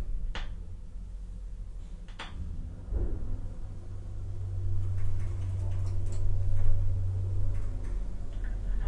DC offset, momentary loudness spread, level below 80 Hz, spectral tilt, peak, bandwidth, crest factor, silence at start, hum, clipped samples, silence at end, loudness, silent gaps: under 0.1%; 13 LU; -32 dBFS; -7 dB/octave; -10 dBFS; 4.2 kHz; 18 dB; 0 s; none; under 0.1%; 0 s; -37 LUFS; none